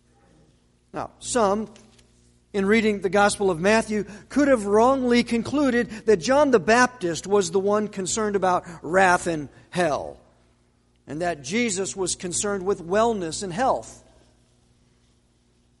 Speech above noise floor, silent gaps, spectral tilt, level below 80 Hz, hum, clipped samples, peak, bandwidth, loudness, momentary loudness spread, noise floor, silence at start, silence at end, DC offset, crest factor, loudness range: 40 dB; none; -4 dB/octave; -52 dBFS; 60 Hz at -45 dBFS; under 0.1%; -4 dBFS; 11.5 kHz; -22 LUFS; 11 LU; -62 dBFS; 0.95 s; 1.85 s; under 0.1%; 18 dB; 6 LU